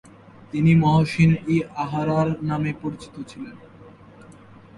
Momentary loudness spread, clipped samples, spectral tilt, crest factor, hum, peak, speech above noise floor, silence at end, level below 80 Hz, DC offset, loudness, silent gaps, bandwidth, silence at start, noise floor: 19 LU; under 0.1%; -8 dB/octave; 16 dB; none; -6 dBFS; 25 dB; 0.9 s; -50 dBFS; under 0.1%; -21 LUFS; none; 11.5 kHz; 0.55 s; -46 dBFS